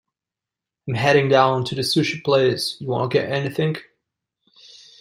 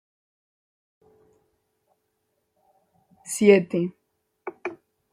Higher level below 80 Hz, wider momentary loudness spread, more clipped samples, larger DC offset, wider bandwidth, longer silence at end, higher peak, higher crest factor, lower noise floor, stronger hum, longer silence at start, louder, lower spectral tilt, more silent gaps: first, -60 dBFS vs -70 dBFS; second, 9 LU vs 23 LU; neither; neither; first, 16 kHz vs 14.5 kHz; first, 1.2 s vs 0.4 s; about the same, -2 dBFS vs -4 dBFS; about the same, 20 dB vs 24 dB; first, -88 dBFS vs -75 dBFS; neither; second, 0.85 s vs 3.25 s; about the same, -20 LUFS vs -22 LUFS; about the same, -5.5 dB/octave vs -5.5 dB/octave; neither